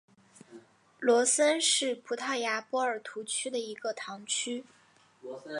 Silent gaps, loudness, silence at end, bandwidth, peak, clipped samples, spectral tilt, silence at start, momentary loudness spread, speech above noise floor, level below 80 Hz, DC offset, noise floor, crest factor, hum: none; -29 LUFS; 0 s; 11.5 kHz; -14 dBFS; under 0.1%; -0.5 dB/octave; 0.5 s; 15 LU; 32 dB; -88 dBFS; under 0.1%; -62 dBFS; 18 dB; none